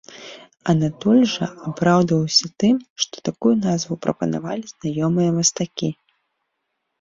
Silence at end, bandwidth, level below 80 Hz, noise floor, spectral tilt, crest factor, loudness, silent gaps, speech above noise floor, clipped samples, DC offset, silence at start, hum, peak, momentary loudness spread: 1.1 s; 7.8 kHz; -58 dBFS; -76 dBFS; -5 dB/octave; 18 dB; -20 LUFS; 2.90-2.96 s; 56 dB; under 0.1%; under 0.1%; 0.1 s; none; -2 dBFS; 11 LU